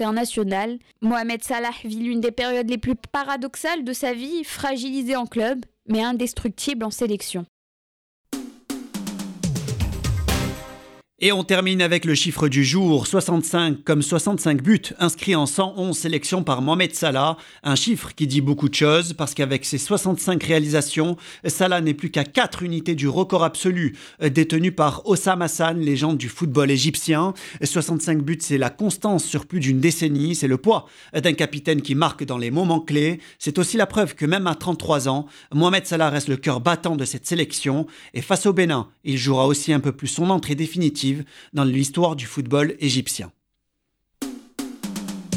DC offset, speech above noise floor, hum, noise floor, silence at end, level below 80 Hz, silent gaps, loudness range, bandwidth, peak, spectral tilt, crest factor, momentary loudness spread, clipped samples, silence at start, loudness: under 0.1%; 54 dB; none; -75 dBFS; 0 s; -44 dBFS; 7.48-8.25 s; 6 LU; 16.5 kHz; -4 dBFS; -4.5 dB/octave; 18 dB; 9 LU; under 0.1%; 0 s; -21 LUFS